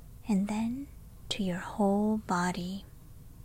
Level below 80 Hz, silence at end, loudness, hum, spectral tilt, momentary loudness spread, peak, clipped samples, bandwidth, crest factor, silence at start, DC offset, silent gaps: -52 dBFS; 0 s; -32 LUFS; none; -6 dB/octave; 13 LU; -18 dBFS; under 0.1%; 16 kHz; 16 dB; 0 s; under 0.1%; none